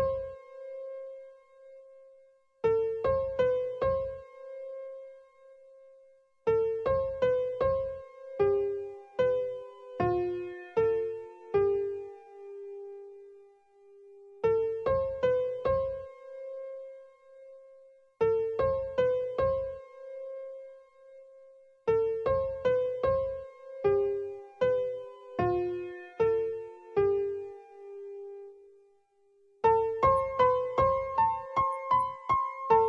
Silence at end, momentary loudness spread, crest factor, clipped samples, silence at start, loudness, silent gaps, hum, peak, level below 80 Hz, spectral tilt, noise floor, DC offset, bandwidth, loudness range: 0 s; 18 LU; 20 dB; under 0.1%; 0 s; -30 LUFS; none; none; -12 dBFS; -56 dBFS; -8 dB/octave; -66 dBFS; under 0.1%; 6.6 kHz; 6 LU